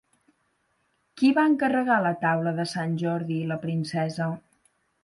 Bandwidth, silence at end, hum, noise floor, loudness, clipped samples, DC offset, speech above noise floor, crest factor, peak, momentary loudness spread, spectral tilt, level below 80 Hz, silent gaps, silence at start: 11.5 kHz; 0.65 s; none; -71 dBFS; -25 LUFS; under 0.1%; under 0.1%; 47 dB; 16 dB; -10 dBFS; 8 LU; -7 dB/octave; -70 dBFS; none; 1.15 s